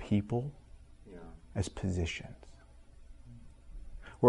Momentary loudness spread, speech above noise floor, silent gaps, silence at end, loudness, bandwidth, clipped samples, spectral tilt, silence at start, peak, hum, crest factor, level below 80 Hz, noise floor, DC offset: 24 LU; 21 dB; none; 0 s; -36 LUFS; 11 kHz; under 0.1%; -6.5 dB/octave; 0 s; -10 dBFS; none; 26 dB; -50 dBFS; -55 dBFS; under 0.1%